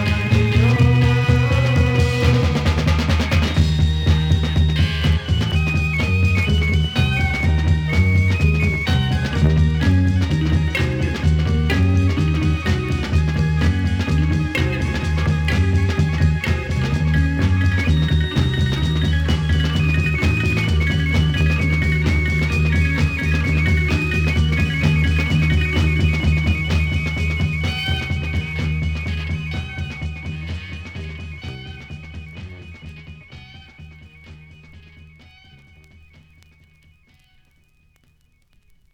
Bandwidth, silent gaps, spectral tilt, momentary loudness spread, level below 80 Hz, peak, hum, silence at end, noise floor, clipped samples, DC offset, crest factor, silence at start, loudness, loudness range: 10 kHz; none; -6.5 dB/octave; 11 LU; -24 dBFS; -2 dBFS; none; 4.15 s; -58 dBFS; under 0.1%; under 0.1%; 16 dB; 0 s; -18 LUFS; 11 LU